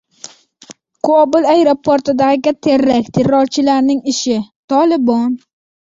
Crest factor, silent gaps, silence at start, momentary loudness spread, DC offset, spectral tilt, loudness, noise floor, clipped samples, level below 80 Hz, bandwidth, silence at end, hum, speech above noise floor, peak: 12 dB; 4.56-4.68 s; 0.7 s; 7 LU; under 0.1%; -5 dB/octave; -13 LUFS; -41 dBFS; under 0.1%; -54 dBFS; 7.8 kHz; 0.55 s; none; 29 dB; -2 dBFS